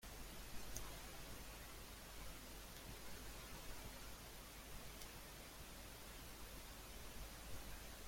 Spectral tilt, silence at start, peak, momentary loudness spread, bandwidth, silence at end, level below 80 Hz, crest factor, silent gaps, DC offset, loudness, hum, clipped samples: -3 dB/octave; 0 s; -30 dBFS; 2 LU; 16.5 kHz; 0 s; -58 dBFS; 24 dB; none; under 0.1%; -55 LUFS; none; under 0.1%